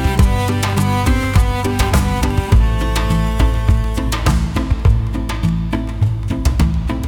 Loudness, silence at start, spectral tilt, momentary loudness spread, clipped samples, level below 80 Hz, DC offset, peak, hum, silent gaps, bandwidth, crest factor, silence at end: -17 LUFS; 0 s; -6 dB/octave; 4 LU; under 0.1%; -18 dBFS; under 0.1%; -2 dBFS; none; none; 18 kHz; 12 dB; 0 s